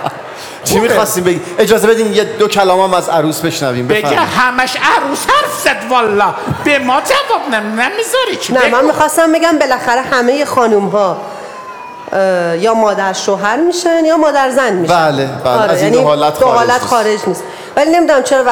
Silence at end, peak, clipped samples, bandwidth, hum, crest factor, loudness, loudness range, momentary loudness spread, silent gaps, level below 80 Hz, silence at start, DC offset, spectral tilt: 0 s; 0 dBFS; under 0.1%; 19 kHz; none; 12 dB; -11 LUFS; 2 LU; 6 LU; none; -48 dBFS; 0 s; 0.2%; -4 dB/octave